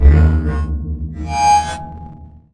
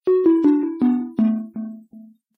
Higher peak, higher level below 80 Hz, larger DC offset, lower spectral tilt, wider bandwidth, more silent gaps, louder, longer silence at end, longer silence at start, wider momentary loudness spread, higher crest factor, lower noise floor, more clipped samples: first, 0 dBFS vs -6 dBFS; first, -18 dBFS vs -66 dBFS; neither; second, -6 dB/octave vs -10.5 dB/octave; first, 11 kHz vs 4.3 kHz; neither; first, -16 LUFS vs -19 LUFS; about the same, 0.25 s vs 0.35 s; about the same, 0 s vs 0.05 s; first, 19 LU vs 16 LU; about the same, 14 dB vs 14 dB; second, -36 dBFS vs -45 dBFS; neither